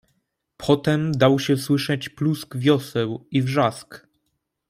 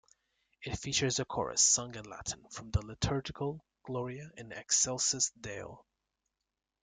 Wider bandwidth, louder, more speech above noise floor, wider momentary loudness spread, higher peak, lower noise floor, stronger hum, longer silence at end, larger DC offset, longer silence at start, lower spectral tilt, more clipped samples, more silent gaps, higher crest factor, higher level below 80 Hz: first, 16 kHz vs 11 kHz; first, -22 LUFS vs -32 LUFS; about the same, 54 dB vs 54 dB; second, 8 LU vs 19 LU; first, -4 dBFS vs -14 dBFS; second, -75 dBFS vs -88 dBFS; neither; second, 0.7 s vs 1 s; neither; about the same, 0.6 s vs 0.6 s; first, -6.5 dB/octave vs -2.5 dB/octave; neither; neither; about the same, 18 dB vs 22 dB; about the same, -58 dBFS vs -54 dBFS